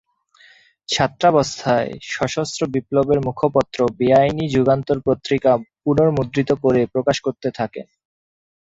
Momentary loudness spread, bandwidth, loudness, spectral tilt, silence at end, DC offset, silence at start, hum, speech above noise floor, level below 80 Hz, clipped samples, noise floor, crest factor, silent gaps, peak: 8 LU; 8 kHz; -19 LUFS; -6 dB/octave; 0.8 s; under 0.1%; 0.9 s; none; 34 dB; -48 dBFS; under 0.1%; -52 dBFS; 18 dB; none; -2 dBFS